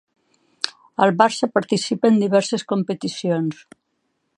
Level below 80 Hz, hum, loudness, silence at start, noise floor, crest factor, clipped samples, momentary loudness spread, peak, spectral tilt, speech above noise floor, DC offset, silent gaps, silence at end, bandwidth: -72 dBFS; none; -20 LUFS; 0.65 s; -72 dBFS; 22 dB; under 0.1%; 12 LU; 0 dBFS; -5 dB/octave; 53 dB; under 0.1%; none; 0.85 s; 11.5 kHz